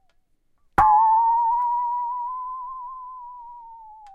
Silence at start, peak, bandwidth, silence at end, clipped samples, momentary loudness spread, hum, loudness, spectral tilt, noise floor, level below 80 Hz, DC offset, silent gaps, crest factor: 0.8 s; -6 dBFS; 11.5 kHz; 0.05 s; under 0.1%; 23 LU; none; -21 LUFS; -6 dB/octave; -64 dBFS; -48 dBFS; under 0.1%; none; 18 dB